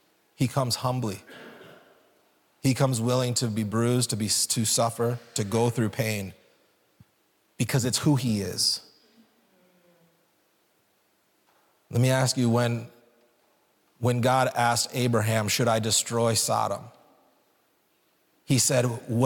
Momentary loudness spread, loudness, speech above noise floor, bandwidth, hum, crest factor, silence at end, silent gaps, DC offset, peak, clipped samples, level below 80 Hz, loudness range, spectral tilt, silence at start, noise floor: 9 LU; -25 LUFS; 43 dB; 18 kHz; none; 16 dB; 0 s; none; under 0.1%; -10 dBFS; under 0.1%; -66 dBFS; 5 LU; -4.5 dB/octave; 0.4 s; -68 dBFS